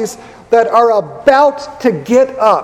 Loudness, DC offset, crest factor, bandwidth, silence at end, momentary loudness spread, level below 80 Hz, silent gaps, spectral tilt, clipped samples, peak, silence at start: -12 LUFS; under 0.1%; 12 dB; 15 kHz; 0 s; 7 LU; -50 dBFS; none; -5 dB/octave; 0.3%; 0 dBFS; 0 s